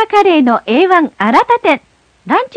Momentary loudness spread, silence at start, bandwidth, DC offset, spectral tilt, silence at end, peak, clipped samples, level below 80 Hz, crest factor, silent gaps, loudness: 6 LU; 0 s; 11 kHz; under 0.1%; -5.5 dB/octave; 0.1 s; 0 dBFS; 0.6%; -56 dBFS; 12 dB; none; -11 LUFS